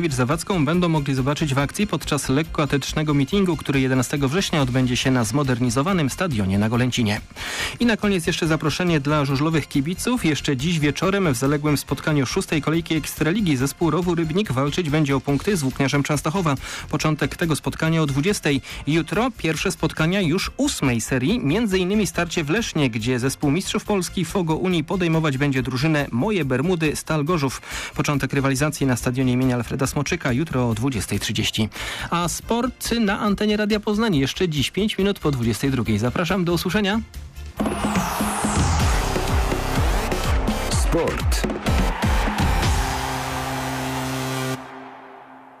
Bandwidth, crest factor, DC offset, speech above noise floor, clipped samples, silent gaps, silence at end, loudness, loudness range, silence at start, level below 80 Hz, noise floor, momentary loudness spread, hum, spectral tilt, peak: 15.5 kHz; 10 dB; under 0.1%; 22 dB; under 0.1%; none; 0.05 s; -22 LUFS; 2 LU; 0 s; -32 dBFS; -43 dBFS; 4 LU; none; -5 dB/octave; -10 dBFS